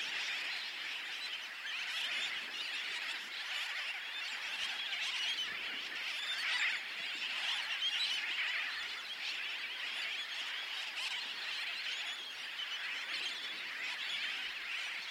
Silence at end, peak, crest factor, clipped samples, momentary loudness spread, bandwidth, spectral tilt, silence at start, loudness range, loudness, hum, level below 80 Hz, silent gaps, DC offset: 0 s; -22 dBFS; 18 dB; under 0.1%; 5 LU; 16.5 kHz; 2 dB/octave; 0 s; 3 LU; -37 LUFS; none; -88 dBFS; none; under 0.1%